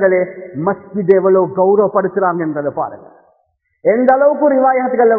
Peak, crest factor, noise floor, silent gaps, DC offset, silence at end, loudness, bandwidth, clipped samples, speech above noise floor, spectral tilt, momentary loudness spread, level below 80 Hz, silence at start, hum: 0 dBFS; 14 dB; -63 dBFS; none; under 0.1%; 0 s; -14 LUFS; 2.9 kHz; under 0.1%; 49 dB; -11.5 dB/octave; 9 LU; -60 dBFS; 0 s; none